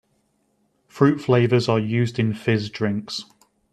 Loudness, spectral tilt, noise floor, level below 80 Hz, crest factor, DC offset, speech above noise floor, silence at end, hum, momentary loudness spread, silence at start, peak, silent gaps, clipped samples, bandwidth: -21 LUFS; -7 dB/octave; -67 dBFS; -60 dBFS; 20 dB; under 0.1%; 47 dB; 0.5 s; none; 9 LU; 0.95 s; -4 dBFS; none; under 0.1%; 9.4 kHz